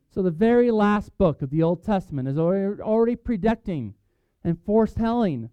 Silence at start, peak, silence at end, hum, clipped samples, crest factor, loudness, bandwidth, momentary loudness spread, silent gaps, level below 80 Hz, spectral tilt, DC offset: 0.15 s; -8 dBFS; 0.05 s; none; under 0.1%; 14 dB; -23 LUFS; 8 kHz; 9 LU; none; -44 dBFS; -9.5 dB/octave; under 0.1%